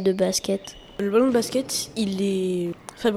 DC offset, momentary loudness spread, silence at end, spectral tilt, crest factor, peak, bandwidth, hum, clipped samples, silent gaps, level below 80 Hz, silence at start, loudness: under 0.1%; 9 LU; 0 s; -4.5 dB/octave; 14 dB; -8 dBFS; 16 kHz; none; under 0.1%; none; -56 dBFS; 0 s; -24 LUFS